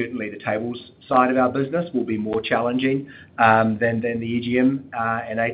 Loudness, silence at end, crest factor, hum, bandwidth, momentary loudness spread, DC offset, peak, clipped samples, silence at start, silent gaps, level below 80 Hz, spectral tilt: -21 LUFS; 0 s; 20 dB; none; 4.9 kHz; 10 LU; under 0.1%; -2 dBFS; under 0.1%; 0 s; none; -60 dBFS; -11 dB/octave